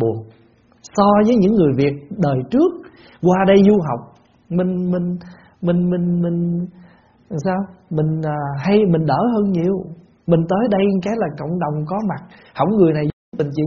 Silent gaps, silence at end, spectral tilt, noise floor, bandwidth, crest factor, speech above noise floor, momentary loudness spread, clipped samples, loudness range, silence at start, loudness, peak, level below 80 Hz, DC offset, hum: 13.13-13.32 s; 0 s; -7.5 dB/octave; -52 dBFS; 7 kHz; 18 dB; 36 dB; 12 LU; under 0.1%; 5 LU; 0 s; -18 LUFS; 0 dBFS; -50 dBFS; under 0.1%; none